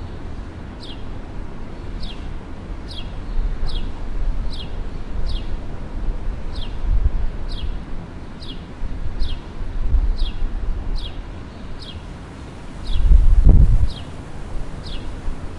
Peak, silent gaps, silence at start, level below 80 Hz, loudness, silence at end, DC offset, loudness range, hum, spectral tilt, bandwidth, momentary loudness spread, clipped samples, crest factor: 0 dBFS; none; 0 s; -22 dBFS; -26 LUFS; 0 s; under 0.1%; 10 LU; none; -7 dB/octave; 5.8 kHz; 16 LU; under 0.1%; 20 dB